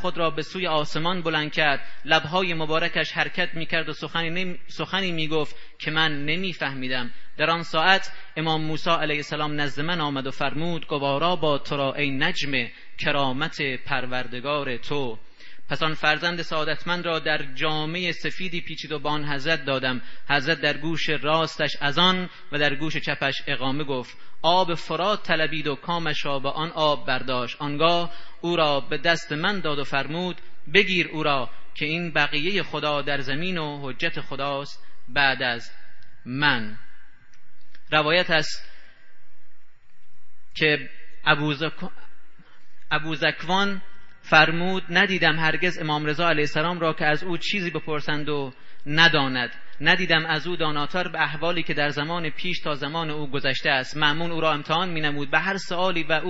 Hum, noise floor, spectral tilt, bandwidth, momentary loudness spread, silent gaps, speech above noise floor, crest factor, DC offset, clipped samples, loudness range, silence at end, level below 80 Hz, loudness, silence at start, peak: none; -44 dBFS; -5 dB/octave; 8 kHz; 9 LU; none; 21 dB; 22 dB; under 0.1%; under 0.1%; 4 LU; 0 s; -60 dBFS; -24 LUFS; 0 s; 0 dBFS